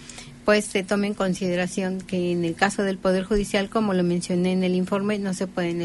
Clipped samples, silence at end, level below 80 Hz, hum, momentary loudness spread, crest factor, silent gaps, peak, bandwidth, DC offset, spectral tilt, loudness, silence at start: under 0.1%; 0 s; -46 dBFS; none; 5 LU; 18 dB; none; -6 dBFS; 11.5 kHz; under 0.1%; -5.5 dB/octave; -24 LUFS; 0 s